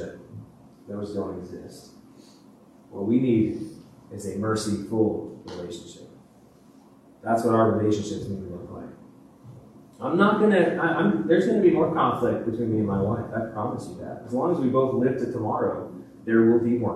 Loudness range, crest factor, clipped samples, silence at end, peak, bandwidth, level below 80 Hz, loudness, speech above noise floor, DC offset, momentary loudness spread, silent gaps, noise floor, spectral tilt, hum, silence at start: 8 LU; 20 dB; under 0.1%; 0 s; -6 dBFS; 12.5 kHz; -60 dBFS; -24 LUFS; 29 dB; under 0.1%; 20 LU; none; -53 dBFS; -7 dB/octave; none; 0 s